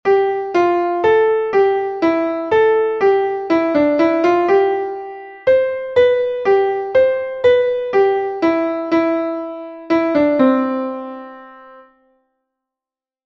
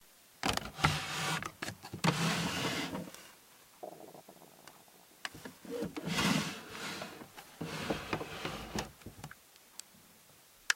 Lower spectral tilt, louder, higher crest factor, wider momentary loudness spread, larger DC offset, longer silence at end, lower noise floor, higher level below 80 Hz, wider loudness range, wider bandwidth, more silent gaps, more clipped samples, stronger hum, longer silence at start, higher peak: first, -6.5 dB/octave vs -3.5 dB/octave; first, -16 LUFS vs -36 LUFS; second, 14 dB vs 32 dB; second, 9 LU vs 23 LU; neither; first, 1.45 s vs 0 s; first, -89 dBFS vs -61 dBFS; about the same, -56 dBFS vs -60 dBFS; second, 4 LU vs 8 LU; second, 6.8 kHz vs 16.5 kHz; neither; neither; neither; about the same, 0.05 s vs 0 s; first, -2 dBFS vs -8 dBFS